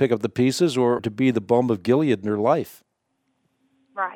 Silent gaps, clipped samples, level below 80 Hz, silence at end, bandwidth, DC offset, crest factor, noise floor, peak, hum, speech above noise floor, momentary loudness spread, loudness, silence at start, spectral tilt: none; under 0.1%; -66 dBFS; 0 s; 17 kHz; under 0.1%; 16 dB; -73 dBFS; -6 dBFS; none; 52 dB; 6 LU; -21 LUFS; 0 s; -6.5 dB/octave